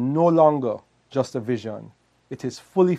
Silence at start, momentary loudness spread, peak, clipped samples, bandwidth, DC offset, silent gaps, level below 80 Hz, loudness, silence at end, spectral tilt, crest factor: 0 s; 18 LU; -4 dBFS; under 0.1%; 10.5 kHz; under 0.1%; none; -70 dBFS; -22 LUFS; 0 s; -8 dB/octave; 18 dB